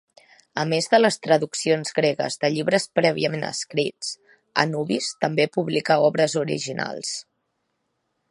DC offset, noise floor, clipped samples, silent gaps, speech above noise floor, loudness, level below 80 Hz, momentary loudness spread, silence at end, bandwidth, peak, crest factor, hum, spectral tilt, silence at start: under 0.1%; -75 dBFS; under 0.1%; none; 52 dB; -22 LUFS; -70 dBFS; 10 LU; 1.1 s; 11.5 kHz; 0 dBFS; 22 dB; none; -4 dB/octave; 0.55 s